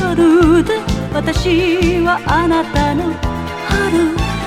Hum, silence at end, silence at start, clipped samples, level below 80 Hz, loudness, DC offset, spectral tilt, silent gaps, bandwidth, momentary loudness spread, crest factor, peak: none; 0 s; 0 s; under 0.1%; -26 dBFS; -14 LUFS; under 0.1%; -6 dB/octave; none; 14 kHz; 8 LU; 14 dB; 0 dBFS